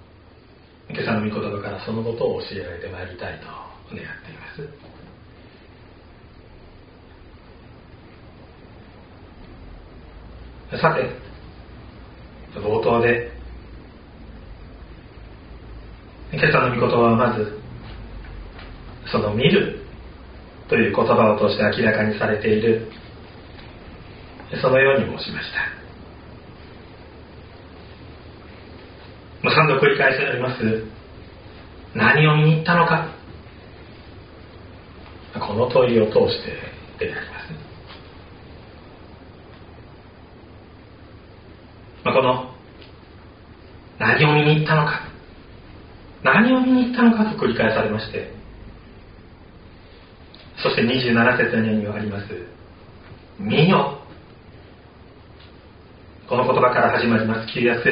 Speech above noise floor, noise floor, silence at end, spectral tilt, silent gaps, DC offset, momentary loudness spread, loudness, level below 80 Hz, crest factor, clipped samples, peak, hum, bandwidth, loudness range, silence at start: 29 dB; -48 dBFS; 0 s; -4.5 dB/octave; none; under 0.1%; 26 LU; -19 LUFS; -46 dBFS; 22 dB; under 0.1%; -2 dBFS; none; 5.2 kHz; 14 LU; 0.9 s